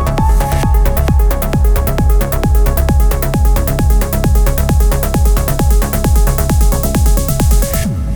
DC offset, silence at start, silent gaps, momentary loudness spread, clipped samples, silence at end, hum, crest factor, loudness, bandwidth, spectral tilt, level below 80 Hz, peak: under 0.1%; 0 s; none; 1 LU; under 0.1%; 0 s; none; 10 dB; -13 LUFS; over 20 kHz; -6 dB/octave; -12 dBFS; 0 dBFS